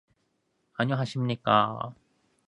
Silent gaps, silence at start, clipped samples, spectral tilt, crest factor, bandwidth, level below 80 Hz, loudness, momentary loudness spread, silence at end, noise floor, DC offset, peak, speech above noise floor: none; 0.8 s; under 0.1%; -7 dB/octave; 22 dB; 10 kHz; -68 dBFS; -27 LUFS; 15 LU; 0.55 s; -74 dBFS; under 0.1%; -8 dBFS; 48 dB